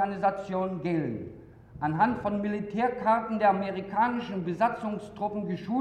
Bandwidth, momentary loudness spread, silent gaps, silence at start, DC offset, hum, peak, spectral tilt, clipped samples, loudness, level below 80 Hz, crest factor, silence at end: 9.6 kHz; 9 LU; none; 0 s; under 0.1%; none; -12 dBFS; -8 dB/octave; under 0.1%; -29 LUFS; -60 dBFS; 18 dB; 0 s